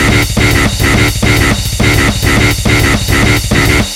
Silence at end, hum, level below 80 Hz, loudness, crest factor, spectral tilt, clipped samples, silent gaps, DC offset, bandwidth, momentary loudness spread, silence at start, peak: 0 s; none; -18 dBFS; -9 LUFS; 10 dB; -4 dB/octave; under 0.1%; none; 0.3%; 17 kHz; 1 LU; 0 s; 0 dBFS